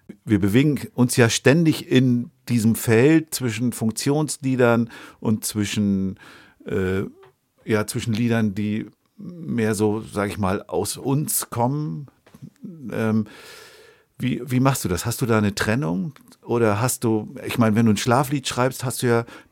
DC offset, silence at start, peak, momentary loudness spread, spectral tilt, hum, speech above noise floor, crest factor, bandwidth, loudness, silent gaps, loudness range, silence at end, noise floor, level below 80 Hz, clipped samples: under 0.1%; 0.1 s; -2 dBFS; 12 LU; -5.5 dB/octave; none; 31 dB; 20 dB; 17 kHz; -22 LUFS; none; 7 LU; 0.1 s; -52 dBFS; -54 dBFS; under 0.1%